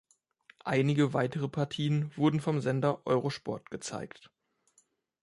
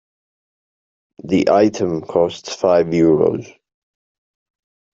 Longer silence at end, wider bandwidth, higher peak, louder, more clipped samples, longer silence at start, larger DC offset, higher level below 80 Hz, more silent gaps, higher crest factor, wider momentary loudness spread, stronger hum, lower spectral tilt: second, 1.15 s vs 1.45 s; first, 11.5 kHz vs 7.8 kHz; second, -14 dBFS vs -2 dBFS; second, -31 LUFS vs -16 LUFS; neither; second, 0.65 s vs 1.25 s; neither; second, -68 dBFS vs -56 dBFS; neither; about the same, 18 dB vs 16 dB; first, 11 LU vs 7 LU; neither; about the same, -6.5 dB/octave vs -6.5 dB/octave